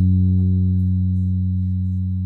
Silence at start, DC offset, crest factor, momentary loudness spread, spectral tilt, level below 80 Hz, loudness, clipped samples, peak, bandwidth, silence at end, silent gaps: 0 s; under 0.1%; 8 dB; 5 LU; -13 dB/octave; -50 dBFS; -20 LUFS; under 0.1%; -10 dBFS; 0.5 kHz; 0 s; none